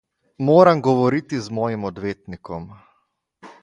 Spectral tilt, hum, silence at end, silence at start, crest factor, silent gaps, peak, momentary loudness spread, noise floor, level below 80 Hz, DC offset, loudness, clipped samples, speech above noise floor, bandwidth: -7.5 dB/octave; none; 0.1 s; 0.4 s; 20 dB; none; 0 dBFS; 20 LU; -69 dBFS; -54 dBFS; under 0.1%; -19 LUFS; under 0.1%; 50 dB; 10.5 kHz